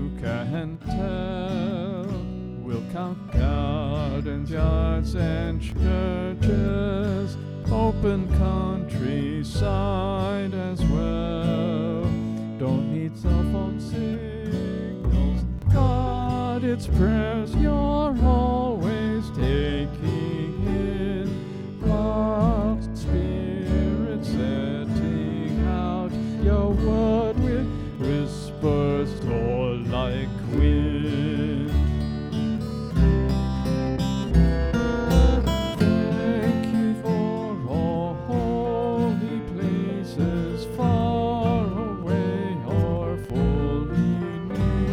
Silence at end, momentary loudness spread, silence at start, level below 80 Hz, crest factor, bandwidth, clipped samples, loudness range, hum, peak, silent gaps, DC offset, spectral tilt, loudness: 0 s; 7 LU; 0 s; -30 dBFS; 18 dB; 11.5 kHz; under 0.1%; 3 LU; none; -6 dBFS; none; under 0.1%; -8 dB/octave; -25 LUFS